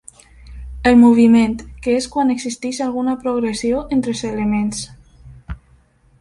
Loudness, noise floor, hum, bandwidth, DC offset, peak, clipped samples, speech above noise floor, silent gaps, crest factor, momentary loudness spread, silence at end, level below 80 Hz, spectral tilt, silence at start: -17 LUFS; -53 dBFS; none; 11.5 kHz; under 0.1%; -2 dBFS; under 0.1%; 37 dB; none; 14 dB; 25 LU; 0.65 s; -40 dBFS; -5.5 dB/octave; 0.45 s